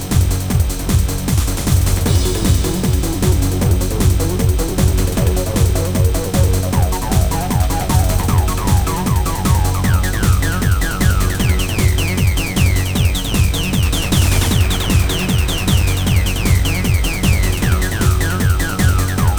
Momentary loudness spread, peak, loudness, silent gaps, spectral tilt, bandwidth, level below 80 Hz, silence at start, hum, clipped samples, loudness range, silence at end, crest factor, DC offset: 2 LU; -2 dBFS; -16 LUFS; none; -5 dB/octave; over 20 kHz; -20 dBFS; 0 s; none; under 0.1%; 1 LU; 0 s; 12 dB; 2%